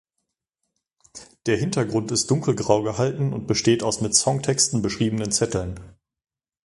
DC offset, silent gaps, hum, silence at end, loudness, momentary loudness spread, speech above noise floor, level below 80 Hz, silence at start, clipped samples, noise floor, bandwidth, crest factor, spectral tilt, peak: under 0.1%; none; none; 0.75 s; -22 LUFS; 7 LU; 58 dB; -50 dBFS; 1.15 s; under 0.1%; -80 dBFS; 11.5 kHz; 22 dB; -4 dB/octave; -2 dBFS